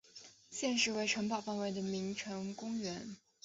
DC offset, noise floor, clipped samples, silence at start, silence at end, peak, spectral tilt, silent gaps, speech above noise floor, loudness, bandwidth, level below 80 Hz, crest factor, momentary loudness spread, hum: under 0.1%; -58 dBFS; under 0.1%; 0.15 s; 0.25 s; -18 dBFS; -3 dB/octave; none; 21 dB; -37 LUFS; 8 kHz; -76 dBFS; 20 dB; 15 LU; none